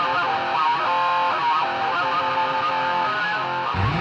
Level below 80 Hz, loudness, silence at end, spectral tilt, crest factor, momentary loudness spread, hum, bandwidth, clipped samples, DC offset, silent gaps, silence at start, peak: -48 dBFS; -21 LUFS; 0 s; -5 dB/octave; 12 dB; 3 LU; none; 8.2 kHz; under 0.1%; under 0.1%; none; 0 s; -10 dBFS